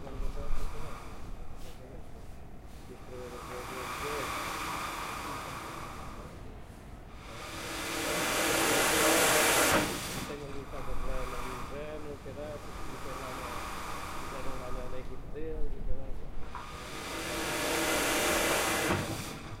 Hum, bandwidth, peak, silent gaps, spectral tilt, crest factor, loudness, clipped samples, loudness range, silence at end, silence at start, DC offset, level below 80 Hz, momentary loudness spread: none; 16 kHz; -12 dBFS; none; -2.5 dB/octave; 20 dB; -32 LUFS; under 0.1%; 14 LU; 0 s; 0 s; under 0.1%; -42 dBFS; 22 LU